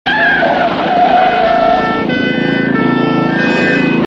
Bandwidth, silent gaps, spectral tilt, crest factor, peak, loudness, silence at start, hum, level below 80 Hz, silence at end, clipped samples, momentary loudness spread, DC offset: 7.8 kHz; none; -6.5 dB/octave; 12 dB; 0 dBFS; -11 LUFS; 0.05 s; none; -42 dBFS; 0 s; under 0.1%; 3 LU; under 0.1%